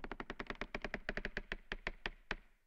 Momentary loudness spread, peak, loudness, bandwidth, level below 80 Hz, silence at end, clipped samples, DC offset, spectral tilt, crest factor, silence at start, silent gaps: 4 LU; -22 dBFS; -45 LUFS; 8.2 kHz; -52 dBFS; 0.1 s; under 0.1%; under 0.1%; -4.5 dB/octave; 24 dB; 0 s; none